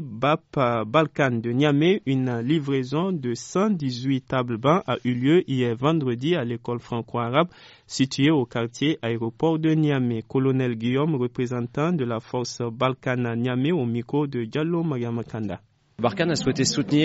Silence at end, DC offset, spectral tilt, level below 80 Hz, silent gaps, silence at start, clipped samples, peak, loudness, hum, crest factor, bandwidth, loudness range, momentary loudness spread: 0 s; under 0.1%; -5.5 dB/octave; -58 dBFS; none; 0 s; under 0.1%; -6 dBFS; -24 LUFS; none; 16 dB; 8 kHz; 3 LU; 7 LU